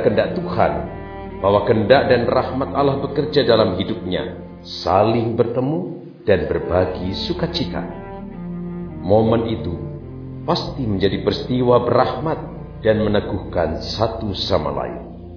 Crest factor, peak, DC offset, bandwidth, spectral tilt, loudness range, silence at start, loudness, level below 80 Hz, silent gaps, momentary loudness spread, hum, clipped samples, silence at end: 20 dB; 0 dBFS; under 0.1%; 5.4 kHz; -7.5 dB/octave; 5 LU; 0 s; -19 LUFS; -38 dBFS; none; 15 LU; none; under 0.1%; 0 s